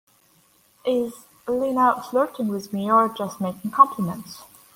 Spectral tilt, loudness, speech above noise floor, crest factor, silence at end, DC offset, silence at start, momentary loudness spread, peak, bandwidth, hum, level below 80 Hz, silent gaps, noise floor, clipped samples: -6 dB/octave; -22 LUFS; 37 dB; 22 dB; 0.3 s; under 0.1%; 0.85 s; 15 LU; -2 dBFS; 16.5 kHz; none; -66 dBFS; none; -59 dBFS; under 0.1%